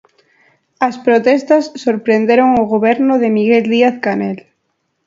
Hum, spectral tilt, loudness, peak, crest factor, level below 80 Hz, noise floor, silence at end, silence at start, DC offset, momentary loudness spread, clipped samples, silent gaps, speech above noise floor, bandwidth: none; -6.5 dB/octave; -13 LUFS; 0 dBFS; 14 dB; -56 dBFS; -67 dBFS; 0.65 s; 0.8 s; under 0.1%; 8 LU; under 0.1%; none; 55 dB; 7.6 kHz